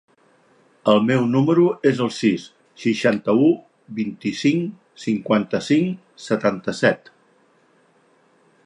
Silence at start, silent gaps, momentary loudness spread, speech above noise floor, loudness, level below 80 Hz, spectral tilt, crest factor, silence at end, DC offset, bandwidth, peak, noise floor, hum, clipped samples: 0.85 s; none; 11 LU; 39 dB; -20 LUFS; -66 dBFS; -6.5 dB/octave; 18 dB; 1.7 s; under 0.1%; 11 kHz; -4 dBFS; -59 dBFS; none; under 0.1%